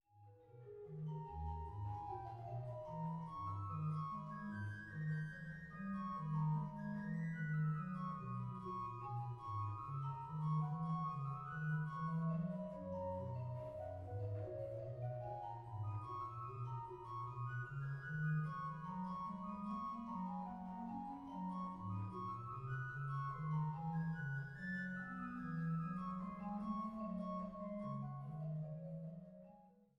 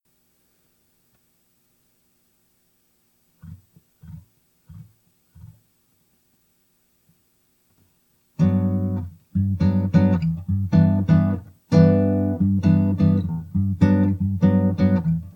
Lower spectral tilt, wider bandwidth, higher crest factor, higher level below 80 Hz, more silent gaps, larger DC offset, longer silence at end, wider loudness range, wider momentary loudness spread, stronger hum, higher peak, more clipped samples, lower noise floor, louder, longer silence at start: about the same, -9.5 dB/octave vs -10 dB/octave; about the same, 5.8 kHz vs 6.2 kHz; about the same, 14 dB vs 18 dB; second, -66 dBFS vs -48 dBFS; neither; neither; about the same, 0.15 s vs 0.05 s; second, 4 LU vs 9 LU; about the same, 7 LU vs 8 LU; second, none vs 60 Hz at -55 dBFS; second, -32 dBFS vs -4 dBFS; neither; about the same, -66 dBFS vs -65 dBFS; second, -45 LUFS vs -20 LUFS; second, 0.15 s vs 3.45 s